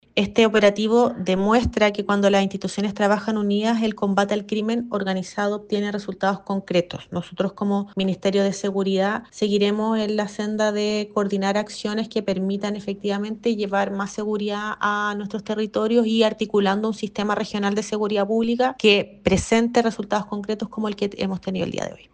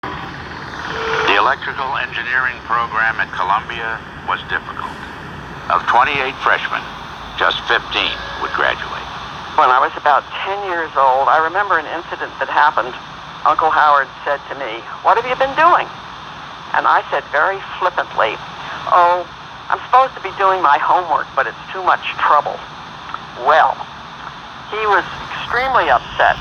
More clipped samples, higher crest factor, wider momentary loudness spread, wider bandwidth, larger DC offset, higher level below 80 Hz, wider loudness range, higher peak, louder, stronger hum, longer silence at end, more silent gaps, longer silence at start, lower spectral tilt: neither; about the same, 18 dB vs 16 dB; second, 8 LU vs 16 LU; about the same, 9.6 kHz vs 9.4 kHz; neither; about the same, -48 dBFS vs -46 dBFS; about the same, 4 LU vs 3 LU; second, -4 dBFS vs 0 dBFS; second, -22 LUFS vs -16 LUFS; neither; first, 0.2 s vs 0 s; neither; about the same, 0.15 s vs 0.05 s; first, -5.5 dB/octave vs -4 dB/octave